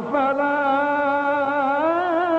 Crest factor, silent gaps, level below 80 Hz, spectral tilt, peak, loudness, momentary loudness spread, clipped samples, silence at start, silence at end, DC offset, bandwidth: 12 dB; none; -62 dBFS; -6.5 dB/octave; -8 dBFS; -20 LUFS; 1 LU; under 0.1%; 0 s; 0 s; under 0.1%; 8 kHz